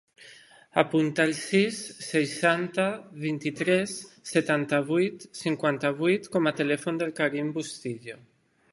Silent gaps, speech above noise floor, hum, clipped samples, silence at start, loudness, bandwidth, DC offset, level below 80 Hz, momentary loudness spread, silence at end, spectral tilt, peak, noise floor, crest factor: none; 26 dB; none; under 0.1%; 0.2 s; -27 LUFS; 11.5 kHz; under 0.1%; -72 dBFS; 10 LU; 0.55 s; -5 dB/octave; -2 dBFS; -52 dBFS; 24 dB